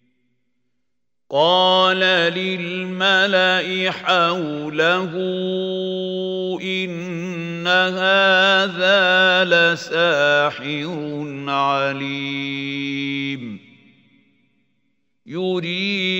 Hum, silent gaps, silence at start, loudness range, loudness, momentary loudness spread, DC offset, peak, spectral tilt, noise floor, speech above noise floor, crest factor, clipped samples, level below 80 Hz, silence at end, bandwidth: none; none; 1.3 s; 10 LU; -18 LUFS; 12 LU; under 0.1%; -2 dBFS; -4.5 dB/octave; -81 dBFS; 62 dB; 18 dB; under 0.1%; -72 dBFS; 0 s; 16 kHz